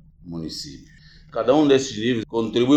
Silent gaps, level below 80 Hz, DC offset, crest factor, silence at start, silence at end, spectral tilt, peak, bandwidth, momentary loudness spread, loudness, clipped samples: none; -52 dBFS; under 0.1%; 16 dB; 0.25 s; 0 s; -5.5 dB/octave; -4 dBFS; 12 kHz; 17 LU; -21 LUFS; under 0.1%